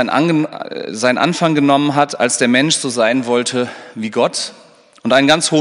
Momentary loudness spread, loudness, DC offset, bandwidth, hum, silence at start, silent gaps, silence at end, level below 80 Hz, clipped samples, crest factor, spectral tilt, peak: 12 LU; -15 LUFS; under 0.1%; 11 kHz; none; 0 s; none; 0 s; -64 dBFS; under 0.1%; 16 dB; -4 dB/octave; 0 dBFS